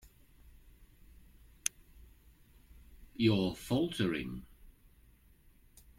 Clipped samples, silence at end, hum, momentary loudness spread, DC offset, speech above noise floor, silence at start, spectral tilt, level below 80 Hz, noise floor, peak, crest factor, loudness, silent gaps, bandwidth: under 0.1%; 1.3 s; none; 15 LU; under 0.1%; 31 dB; 0.05 s; -5 dB/octave; -58 dBFS; -63 dBFS; -10 dBFS; 28 dB; -34 LUFS; none; 16.5 kHz